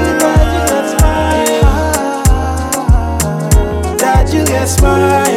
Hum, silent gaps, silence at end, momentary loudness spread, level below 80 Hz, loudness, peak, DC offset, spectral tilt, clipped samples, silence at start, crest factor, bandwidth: none; none; 0 s; 5 LU; -14 dBFS; -12 LUFS; 0 dBFS; under 0.1%; -5 dB/octave; under 0.1%; 0 s; 10 dB; 16.5 kHz